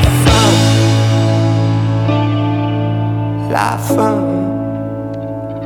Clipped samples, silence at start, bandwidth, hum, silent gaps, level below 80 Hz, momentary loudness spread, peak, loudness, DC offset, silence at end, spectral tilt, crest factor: under 0.1%; 0 s; 17 kHz; none; none; -28 dBFS; 11 LU; 0 dBFS; -14 LUFS; under 0.1%; 0 s; -6 dB/octave; 12 dB